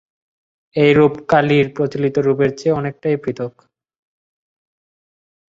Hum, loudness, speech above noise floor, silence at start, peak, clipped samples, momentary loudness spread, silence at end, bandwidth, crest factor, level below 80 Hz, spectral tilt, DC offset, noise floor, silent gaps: none; -16 LUFS; over 74 dB; 0.75 s; -2 dBFS; under 0.1%; 12 LU; 2 s; 7.6 kHz; 18 dB; -54 dBFS; -7.5 dB/octave; under 0.1%; under -90 dBFS; none